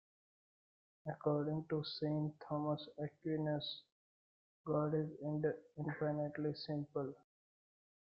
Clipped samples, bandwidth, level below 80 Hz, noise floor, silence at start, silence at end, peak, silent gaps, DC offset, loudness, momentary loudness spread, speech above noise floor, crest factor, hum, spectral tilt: under 0.1%; 5.6 kHz; -78 dBFS; under -90 dBFS; 1.05 s; 0.95 s; -24 dBFS; 3.92-4.64 s; under 0.1%; -41 LUFS; 9 LU; over 50 dB; 18 dB; none; -9.5 dB/octave